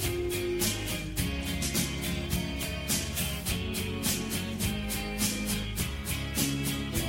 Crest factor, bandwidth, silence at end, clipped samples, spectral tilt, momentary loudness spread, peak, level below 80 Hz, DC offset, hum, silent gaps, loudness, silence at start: 18 dB; 17 kHz; 0 s; under 0.1%; -3.5 dB/octave; 4 LU; -12 dBFS; -40 dBFS; under 0.1%; none; none; -31 LUFS; 0 s